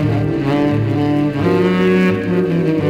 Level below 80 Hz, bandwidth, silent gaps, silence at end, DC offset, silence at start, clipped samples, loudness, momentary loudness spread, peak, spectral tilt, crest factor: -42 dBFS; 10 kHz; none; 0 s; under 0.1%; 0 s; under 0.1%; -15 LUFS; 3 LU; -2 dBFS; -8.5 dB/octave; 12 dB